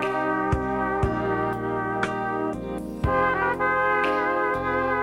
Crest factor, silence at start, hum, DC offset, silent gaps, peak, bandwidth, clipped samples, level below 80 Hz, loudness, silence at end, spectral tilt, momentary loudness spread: 14 dB; 0 s; none; under 0.1%; none; -10 dBFS; 16 kHz; under 0.1%; -40 dBFS; -24 LUFS; 0 s; -7 dB/octave; 6 LU